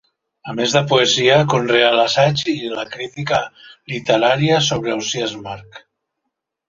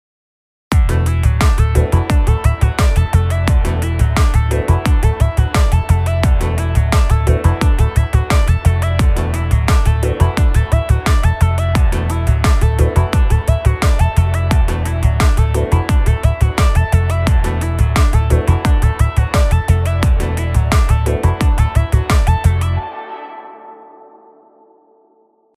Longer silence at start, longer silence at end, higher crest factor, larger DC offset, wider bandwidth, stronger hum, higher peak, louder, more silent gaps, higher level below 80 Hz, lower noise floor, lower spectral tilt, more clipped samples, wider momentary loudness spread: second, 0.45 s vs 0.7 s; second, 0.9 s vs 1.8 s; about the same, 16 dB vs 12 dB; neither; second, 7.8 kHz vs 15 kHz; neither; about the same, -2 dBFS vs 0 dBFS; about the same, -16 LUFS vs -15 LUFS; neither; second, -54 dBFS vs -16 dBFS; first, -77 dBFS vs -55 dBFS; second, -4 dB/octave vs -6.5 dB/octave; neither; first, 16 LU vs 3 LU